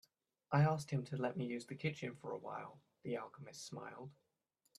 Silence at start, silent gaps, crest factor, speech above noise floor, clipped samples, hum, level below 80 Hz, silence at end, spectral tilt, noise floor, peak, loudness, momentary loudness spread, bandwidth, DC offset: 0.5 s; none; 20 dB; 42 dB; under 0.1%; none; -80 dBFS; 0.65 s; -6.5 dB/octave; -83 dBFS; -22 dBFS; -42 LUFS; 18 LU; 12.5 kHz; under 0.1%